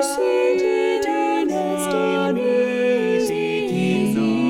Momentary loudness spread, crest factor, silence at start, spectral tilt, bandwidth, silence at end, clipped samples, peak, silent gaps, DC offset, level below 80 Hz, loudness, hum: 3 LU; 12 dB; 0 s; -5.5 dB/octave; 17 kHz; 0 s; under 0.1%; -8 dBFS; none; under 0.1%; -60 dBFS; -20 LUFS; none